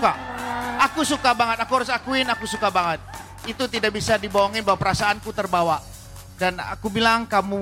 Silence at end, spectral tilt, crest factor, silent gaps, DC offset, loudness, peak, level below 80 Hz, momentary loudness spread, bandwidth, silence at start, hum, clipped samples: 0 s; -3.5 dB/octave; 16 dB; none; under 0.1%; -22 LUFS; -6 dBFS; -46 dBFS; 10 LU; 17 kHz; 0 s; none; under 0.1%